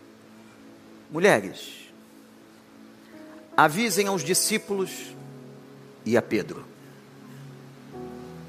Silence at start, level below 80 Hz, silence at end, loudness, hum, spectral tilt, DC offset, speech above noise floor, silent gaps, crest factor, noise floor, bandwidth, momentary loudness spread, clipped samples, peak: 0.65 s; -72 dBFS; 0 s; -24 LUFS; none; -3.5 dB/octave; under 0.1%; 27 dB; none; 26 dB; -51 dBFS; 15.5 kHz; 26 LU; under 0.1%; -4 dBFS